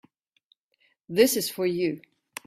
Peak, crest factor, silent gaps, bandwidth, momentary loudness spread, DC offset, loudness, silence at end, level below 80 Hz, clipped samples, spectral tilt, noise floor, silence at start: -6 dBFS; 22 dB; none; 16 kHz; 17 LU; under 0.1%; -25 LUFS; 0.5 s; -68 dBFS; under 0.1%; -3.5 dB/octave; -70 dBFS; 1.1 s